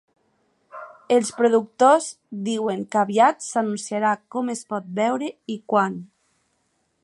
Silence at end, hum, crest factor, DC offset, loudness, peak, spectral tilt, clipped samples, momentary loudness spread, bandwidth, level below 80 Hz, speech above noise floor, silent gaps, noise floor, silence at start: 1 s; none; 20 dB; under 0.1%; -22 LUFS; -4 dBFS; -4.5 dB/octave; under 0.1%; 14 LU; 11.5 kHz; -76 dBFS; 48 dB; none; -70 dBFS; 0.75 s